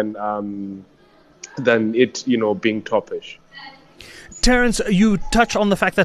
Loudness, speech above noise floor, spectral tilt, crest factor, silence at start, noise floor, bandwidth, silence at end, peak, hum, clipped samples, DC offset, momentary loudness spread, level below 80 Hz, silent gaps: -19 LUFS; 33 dB; -4.5 dB/octave; 18 dB; 0 s; -52 dBFS; 13 kHz; 0 s; -2 dBFS; none; under 0.1%; under 0.1%; 22 LU; -32 dBFS; none